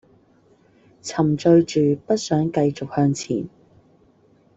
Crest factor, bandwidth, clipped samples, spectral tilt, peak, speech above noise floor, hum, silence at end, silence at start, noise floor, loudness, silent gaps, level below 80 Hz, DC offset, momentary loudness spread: 18 dB; 8 kHz; under 0.1%; -6.5 dB/octave; -4 dBFS; 37 dB; none; 1.1 s; 1.05 s; -57 dBFS; -20 LUFS; none; -58 dBFS; under 0.1%; 12 LU